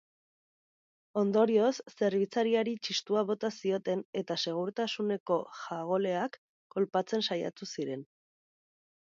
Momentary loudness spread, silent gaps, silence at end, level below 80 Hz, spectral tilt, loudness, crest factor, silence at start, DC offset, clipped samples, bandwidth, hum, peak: 10 LU; 4.05-4.13 s, 5.20-5.26 s, 6.38-6.70 s; 1.15 s; -82 dBFS; -5 dB/octave; -32 LUFS; 18 dB; 1.15 s; under 0.1%; under 0.1%; 7.6 kHz; none; -14 dBFS